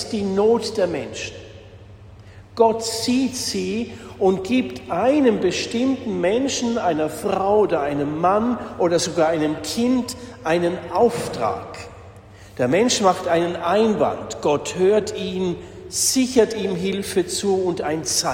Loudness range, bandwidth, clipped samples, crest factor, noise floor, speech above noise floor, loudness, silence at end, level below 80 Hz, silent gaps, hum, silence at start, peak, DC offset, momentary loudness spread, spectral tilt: 3 LU; 16.5 kHz; under 0.1%; 18 dB; -43 dBFS; 22 dB; -21 LUFS; 0 s; -50 dBFS; none; none; 0 s; -4 dBFS; under 0.1%; 9 LU; -4 dB/octave